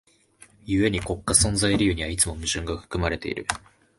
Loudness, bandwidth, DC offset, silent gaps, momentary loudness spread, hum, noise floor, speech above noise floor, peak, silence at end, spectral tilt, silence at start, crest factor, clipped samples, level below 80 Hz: -24 LUFS; 12 kHz; under 0.1%; none; 10 LU; none; -55 dBFS; 31 dB; -2 dBFS; 0.4 s; -3.5 dB/octave; 0.65 s; 24 dB; under 0.1%; -38 dBFS